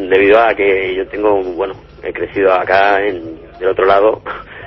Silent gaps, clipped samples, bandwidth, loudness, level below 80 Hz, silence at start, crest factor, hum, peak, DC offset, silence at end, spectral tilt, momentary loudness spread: none; under 0.1%; 6 kHz; -13 LUFS; -42 dBFS; 0 s; 14 dB; none; 0 dBFS; under 0.1%; 0 s; -6.5 dB/octave; 15 LU